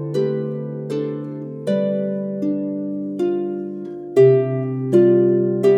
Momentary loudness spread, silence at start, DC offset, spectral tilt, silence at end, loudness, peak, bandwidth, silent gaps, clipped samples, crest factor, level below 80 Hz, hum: 14 LU; 0 s; under 0.1%; -9.5 dB/octave; 0 s; -20 LUFS; -2 dBFS; 9.2 kHz; none; under 0.1%; 16 dB; -70 dBFS; none